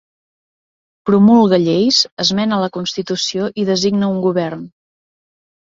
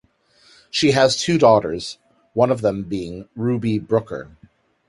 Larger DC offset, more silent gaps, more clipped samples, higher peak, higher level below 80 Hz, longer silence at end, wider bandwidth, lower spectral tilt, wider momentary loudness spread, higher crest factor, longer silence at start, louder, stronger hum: neither; first, 2.12-2.17 s vs none; neither; about the same, 0 dBFS vs -2 dBFS; about the same, -56 dBFS vs -52 dBFS; first, 1 s vs 0.65 s; second, 7.6 kHz vs 11.5 kHz; about the same, -5 dB/octave vs -5 dB/octave; second, 11 LU vs 16 LU; about the same, 16 dB vs 18 dB; first, 1.05 s vs 0.75 s; first, -15 LUFS vs -19 LUFS; neither